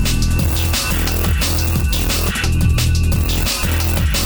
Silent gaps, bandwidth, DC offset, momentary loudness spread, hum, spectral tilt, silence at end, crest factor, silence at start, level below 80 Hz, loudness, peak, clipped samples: none; over 20 kHz; under 0.1%; 1 LU; none; -4 dB/octave; 0 s; 12 dB; 0 s; -20 dBFS; -17 LUFS; -4 dBFS; under 0.1%